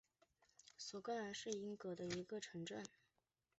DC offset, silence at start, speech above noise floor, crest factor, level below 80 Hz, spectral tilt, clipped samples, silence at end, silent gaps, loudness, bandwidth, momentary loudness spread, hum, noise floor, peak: under 0.1%; 0.65 s; 40 dB; 20 dB; -84 dBFS; -4 dB/octave; under 0.1%; 0.7 s; none; -49 LUFS; 8 kHz; 10 LU; none; -89 dBFS; -30 dBFS